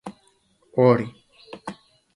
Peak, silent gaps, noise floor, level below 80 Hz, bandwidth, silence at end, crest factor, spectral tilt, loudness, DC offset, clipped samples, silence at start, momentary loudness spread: -4 dBFS; none; -62 dBFS; -64 dBFS; 11 kHz; 0.45 s; 22 dB; -8.5 dB/octave; -20 LUFS; under 0.1%; under 0.1%; 0.05 s; 23 LU